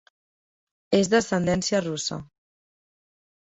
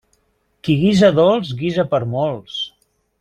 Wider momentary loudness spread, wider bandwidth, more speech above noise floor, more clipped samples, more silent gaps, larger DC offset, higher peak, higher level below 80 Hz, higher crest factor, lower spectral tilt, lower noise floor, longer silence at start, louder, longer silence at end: second, 10 LU vs 14 LU; second, 8.2 kHz vs 11 kHz; first, over 67 dB vs 48 dB; neither; neither; neither; second, -8 dBFS vs -2 dBFS; second, -56 dBFS vs -50 dBFS; about the same, 20 dB vs 16 dB; second, -4.5 dB/octave vs -7 dB/octave; first, under -90 dBFS vs -64 dBFS; first, 0.9 s vs 0.65 s; second, -24 LUFS vs -17 LUFS; first, 1.35 s vs 0.5 s